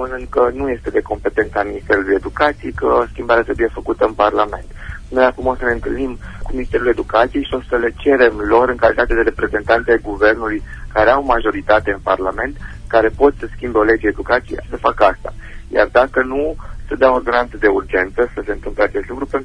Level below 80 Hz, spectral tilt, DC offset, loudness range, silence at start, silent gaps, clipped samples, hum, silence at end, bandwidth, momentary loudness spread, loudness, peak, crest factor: -30 dBFS; -6.5 dB/octave; under 0.1%; 3 LU; 0 s; none; under 0.1%; none; 0 s; 10.5 kHz; 10 LU; -16 LUFS; 0 dBFS; 16 dB